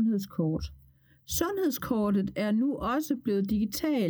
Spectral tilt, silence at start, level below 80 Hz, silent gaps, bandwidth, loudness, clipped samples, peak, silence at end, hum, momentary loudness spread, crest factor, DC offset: -5.5 dB/octave; 0 s; -50 dBFS; none; over 20 kHz; -29 LUFS; under 0.1%; -14 dBFS; 0 s; none; 4 LU; 14 dB; under 0.1%